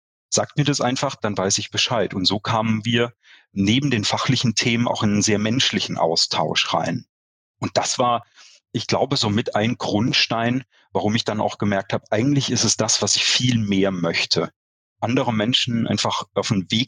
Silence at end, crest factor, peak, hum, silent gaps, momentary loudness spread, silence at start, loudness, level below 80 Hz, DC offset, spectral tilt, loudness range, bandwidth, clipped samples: 0 s; 16 dB; -4 dBFS; none; 7.09-7.54 s, 14.56-14.96 s; 6 LU; 0.3 s; -20 LUFS; -58 dBFS; under 0.1%; -3.5 dB/octave; 3 LU; 10.5 kHz; under 0.1%